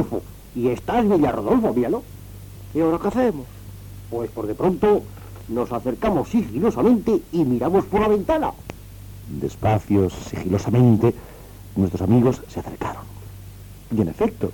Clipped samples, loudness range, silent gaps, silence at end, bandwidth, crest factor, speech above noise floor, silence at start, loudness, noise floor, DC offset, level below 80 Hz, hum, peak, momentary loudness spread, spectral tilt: under 0.1%; 3 LU; none; 0 s; 19 kHz; 16 dB; 20 dB; 0 s; -21 LUFS; -40 dBFS; under 0.1%; -42 dBFS; none; -6 dBFS; 22 LU; -8 dB/octave